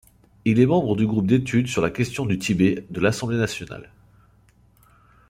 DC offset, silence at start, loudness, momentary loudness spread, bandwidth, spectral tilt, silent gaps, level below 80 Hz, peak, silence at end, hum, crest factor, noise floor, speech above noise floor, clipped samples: under 0.1%; 0.45 s; -22 LUFS; 8 LU; 16 kHz; -6.5 dB/octave; none; -52 dBFS; -4 dBFS; 1.45 s; none; 18 dB; -57 dBFS; 36 dB; under 0.1%